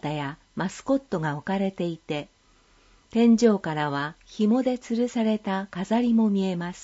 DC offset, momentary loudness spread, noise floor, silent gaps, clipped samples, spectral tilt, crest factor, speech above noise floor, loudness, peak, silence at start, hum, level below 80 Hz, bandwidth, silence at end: under 0.1%; 12 LU; -60 dBFS; none; under 0.1%; -6.5 dB/octave; 18 dB; 35 dB; -25 LUFS; -8 dBFS; 0 s; none; -60 dBFS; 8 kHz; 0 s